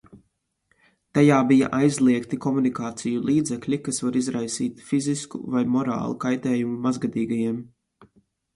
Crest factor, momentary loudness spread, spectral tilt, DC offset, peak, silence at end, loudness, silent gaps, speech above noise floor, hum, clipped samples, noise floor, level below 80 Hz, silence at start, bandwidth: 18 dB; 9 LU; -6 dB/octave; under 0.1%; -4 dBFS; 0.9 s; -23 LUFS; none; 50 dB; none; under 0.1%; -72 dBFS; -62 dBFS; 0.15 s; 11.5 kHz